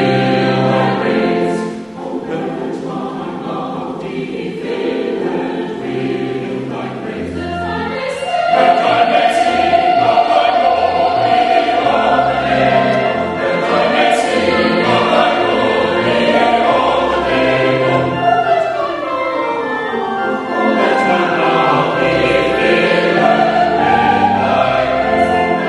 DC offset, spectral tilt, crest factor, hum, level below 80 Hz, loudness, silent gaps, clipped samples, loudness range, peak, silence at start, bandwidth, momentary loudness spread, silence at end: under 0.1%; -5.5 dB/octave; 14 dB; none; -44 dBFS; -14 LUFS; none; under 0.1%; 8 LU; 0 dBFS; 0 s; 11.5 kHz; 10 LU; 0 s